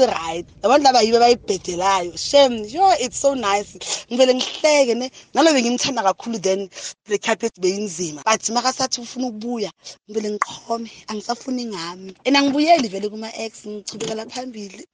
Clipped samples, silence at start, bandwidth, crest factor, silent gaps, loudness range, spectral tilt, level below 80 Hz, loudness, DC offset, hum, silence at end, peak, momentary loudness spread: under 0.1%; 0 s; 10 kHz; 18 dB; none; 7 LU; -2.5 dB/octave; -58 dBFS; -19 LUFS; under 0.1%; none; 0.1 s; -2 dBFS; 14 LU